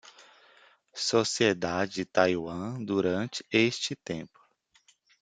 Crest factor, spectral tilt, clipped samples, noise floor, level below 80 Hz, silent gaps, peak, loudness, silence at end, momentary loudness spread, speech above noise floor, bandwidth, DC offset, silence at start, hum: 24 dB; -4 dB/octave; under 0.1%; -66 dBFS; -68 dBFS; none; -6 dBFS; -28 LUFS; 0.95 s; 12 LU; 37 dB; 9.6 kHz; under 0.1%; 0.05 s; none